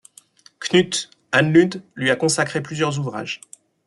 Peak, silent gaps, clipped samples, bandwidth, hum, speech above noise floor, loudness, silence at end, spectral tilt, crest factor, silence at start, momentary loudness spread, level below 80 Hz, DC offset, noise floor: -2 dBFS; none; under 0.1%; 12 kHz; none; 32 dB; -20 LUFS; 0.5 s; -4.5 dB/octave; 20 dB; 0.6 s; 13 LU; -62 dBFS; under 0.1%; -51 dBFS